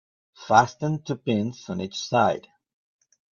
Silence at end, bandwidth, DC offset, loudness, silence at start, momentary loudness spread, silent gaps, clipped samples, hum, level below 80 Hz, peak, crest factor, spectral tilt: 0.95 s; 7.2 kHz; under 0.1%; -24 LUFS; 0.4 s; 12 LU; none; under 0.1%; none; -64 dBFS; -2 dBFS; 24 dB; -5.5 dB/octave